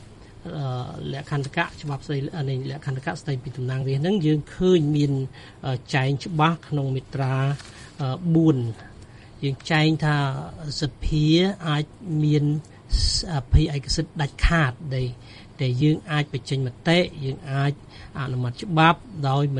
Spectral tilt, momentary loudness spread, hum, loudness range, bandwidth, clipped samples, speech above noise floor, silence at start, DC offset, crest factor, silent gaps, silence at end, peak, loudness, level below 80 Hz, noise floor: -6 dB/octave; 12 LU; none; 3 LU; 10 kHz; under 0.1%; 21 dB; 0 s; under 0.1%; 20 dB; none; 0 s; -2 dBFS; -24 LUFS; -34 dBFS; -44 dBFS